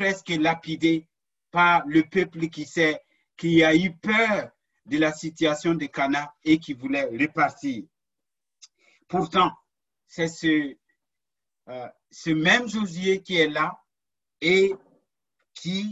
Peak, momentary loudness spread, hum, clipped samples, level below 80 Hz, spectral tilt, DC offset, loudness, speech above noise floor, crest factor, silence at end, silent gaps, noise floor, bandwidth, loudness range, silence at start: -6 dBFS; 15 LU; none; under 0.1%; -62 dBFS; -5 dB/octave; under 0.1%; -23 LUFS; over 67 dB; 20 dB; 0 s; none; under -90 dBFS; 8 kHz; 5 LU; 0 s